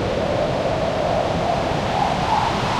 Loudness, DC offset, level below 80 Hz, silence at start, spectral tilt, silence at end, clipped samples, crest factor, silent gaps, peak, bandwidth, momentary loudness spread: -21 LUFS; under 0.1%; -36 dBFS; 0 s; -5.5 dB/octave; 0 s; under 0.1%; 14 dB; none; -8 dBFS; 14 kHz; 2 LU